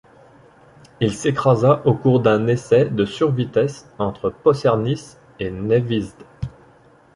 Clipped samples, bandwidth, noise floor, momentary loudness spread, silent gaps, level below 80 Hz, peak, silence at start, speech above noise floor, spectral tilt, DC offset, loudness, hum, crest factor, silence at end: under 0.1%; 11 kHz; -51 dBFS; 13 LU; none; -48 dBFS; -2 dBFS; 1 s; 33 dB; -7 dB/octave; under 0.1%; -19 LUFS; none; 18 dB; 0.65 s